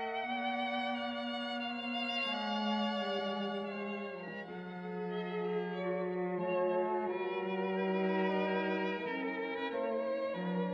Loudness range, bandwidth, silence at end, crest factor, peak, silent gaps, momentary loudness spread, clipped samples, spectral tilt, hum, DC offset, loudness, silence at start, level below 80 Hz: 4 LU; 7.8 kHz; 0 s; 14 dB; -22 dBFS; none; 7 LU; under 0.1%; -7 dB/octave; none; under 0.1%; -36 LUFS; 0 s; -82 dBFS